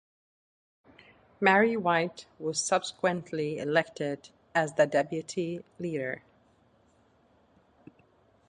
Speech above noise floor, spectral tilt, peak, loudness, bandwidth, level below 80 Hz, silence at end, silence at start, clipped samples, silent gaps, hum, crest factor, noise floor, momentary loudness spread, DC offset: 36 dB; -4 dB/octave; -8 dBFS; -29 LUFS; 11 kHz; -72 dBFS; 2.3 s; 1.4 s; under 0.1%; none; none; 24 dB; -65 dBFS; 12 LU; under 0.1%